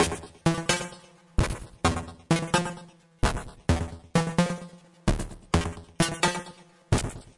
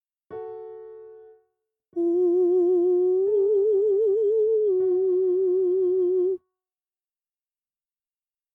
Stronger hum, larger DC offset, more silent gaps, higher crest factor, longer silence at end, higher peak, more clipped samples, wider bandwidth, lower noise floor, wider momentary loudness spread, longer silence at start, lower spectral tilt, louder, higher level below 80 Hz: neither; neither; neither; first, 18 dB vs 8 dB; second, 0.05 s vs 2.15 s; first, -10 dBFS vs -16 dBFS; neither; first, 11.5 kHz vs 1.8 kHz; second, -50 dBFS vs under -90 dBFS; second, 11 LU vs 17 LU; second, 0 s vs 0.3 s; second, -4.5 dB/octave vs -9.5 dB/octave; second, -28 LUFS vs -22 LUFS; first, -38 dBFS vs -76 dBFS